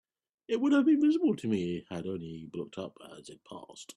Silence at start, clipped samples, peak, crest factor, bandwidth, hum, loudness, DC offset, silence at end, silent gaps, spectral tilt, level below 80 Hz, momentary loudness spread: 0.5 s; under 0.1%; -16 dBFS; 16 dB; 11 kHz; none; -30 LUFS; under 0.1%; 0.05 s; none; -6.5 dB/octave; -72 dBFS; 23 LU